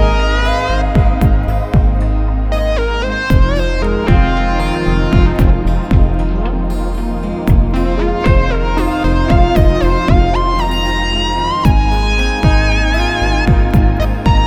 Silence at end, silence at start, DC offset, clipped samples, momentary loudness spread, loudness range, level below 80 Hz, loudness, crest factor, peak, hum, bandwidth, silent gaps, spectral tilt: 0 s; 0 s; under 0.1%; under 0.1%; 5 LU; 2 LU; -14 dBFS; -14 LUFS; 12 dB; 0 dBFS; none; 9 kHz; none; -6.5 dB/octave